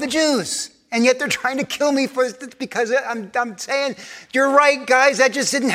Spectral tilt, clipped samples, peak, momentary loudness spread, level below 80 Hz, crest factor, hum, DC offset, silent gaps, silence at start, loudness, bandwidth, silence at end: -2.5 dB/octave; under 0.1%; 0 dBFS; 10 LU; -66 dBFS; 18 dB; none; under 0.1%; none; 0 s; -19 LUFS; 15.5 kHz; 0 s